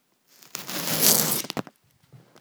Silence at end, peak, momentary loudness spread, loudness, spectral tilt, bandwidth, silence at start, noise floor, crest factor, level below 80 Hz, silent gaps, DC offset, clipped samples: 0.25 s; 0 dBFS; 18 LU; -21 LUFS; -1.5 dB/octave; over 20 kHz; 0.55 s; -56 dBFS; 28 dB; -70 dBFS; none; under 0.1%; under 0.1%